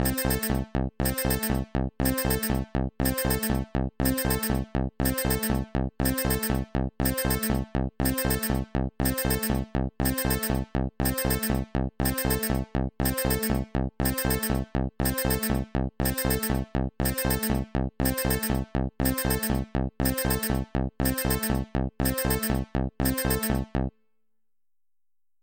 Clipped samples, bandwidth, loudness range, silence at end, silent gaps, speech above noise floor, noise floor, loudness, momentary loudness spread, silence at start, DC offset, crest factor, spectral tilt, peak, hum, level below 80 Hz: under 0.1%; 17 kHz; 0 LU; 1.55 s; none; over 63 dB; under -90 dBFS; -27 LUFS; 6 LU; 0 s; under 0.1%; 16 dB; -5 dB/octave; -10 dBFS; none; -34 dBFS